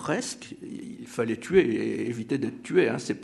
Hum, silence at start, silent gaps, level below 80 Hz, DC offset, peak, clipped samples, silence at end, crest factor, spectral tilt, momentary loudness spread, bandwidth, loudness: none; 0 s; none; -60 dBFS; under 0.1%; -8 dBFS; under 0.1%; 0 s; 20 dB; -5.5 dB/octave; 16 LU; 12 kHz; -27 LUFS